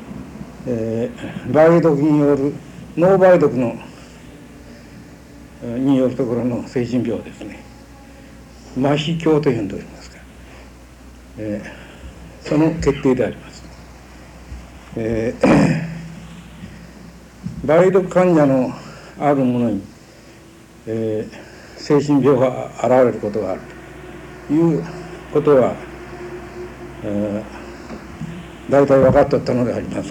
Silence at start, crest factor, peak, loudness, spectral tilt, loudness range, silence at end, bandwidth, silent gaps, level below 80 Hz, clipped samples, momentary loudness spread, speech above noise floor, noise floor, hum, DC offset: 0 s; 18 dB; 0 dBFS; -17 LUFS; -7.5 dB/octave; 6 LU; 0 s; 17.5 kHz; none; -42 dBFS; under 0.1%; 24 LU; 27 dB; -43 dBFS; none; under 0.1%